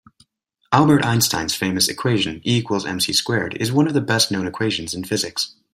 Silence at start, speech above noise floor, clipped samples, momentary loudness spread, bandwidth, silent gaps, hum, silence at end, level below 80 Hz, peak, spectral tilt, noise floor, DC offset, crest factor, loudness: 0.7 s; 47 dB; under 0.1%; 7 LU; 16 kHz; none; none; 0.25 s; -54 dBFS; -2 dBFS; -4 dB/octave; -66 dBFS; under 0.1%; 18 dB; -19 LUFS